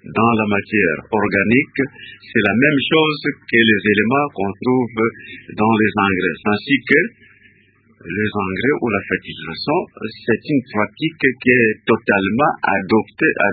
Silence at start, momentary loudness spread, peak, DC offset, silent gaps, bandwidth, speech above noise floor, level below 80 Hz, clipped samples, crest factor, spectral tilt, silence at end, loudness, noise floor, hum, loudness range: 0.05 s; 9 LU; 0 dBFS; under 0.1%; none; 4.8 kHz; 37 dB; -50 dBFS; under 0.1%; 18 dB; -9 dB/octave; 0 s; -17 LUFS; -54 dBFS; none; 5 LU